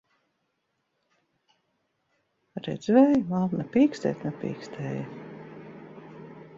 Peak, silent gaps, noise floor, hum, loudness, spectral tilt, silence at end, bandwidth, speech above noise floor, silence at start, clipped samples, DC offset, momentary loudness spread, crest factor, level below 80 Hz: -8 dBFS; none; -77 dBFS; none; -26 LUFS; -8 dB/octave; 0 s; 7.6 kHz; 52 dB; 2.55 s; under 0.1%; under 0.1%; 25 LU; 20 dB; -68 dBFS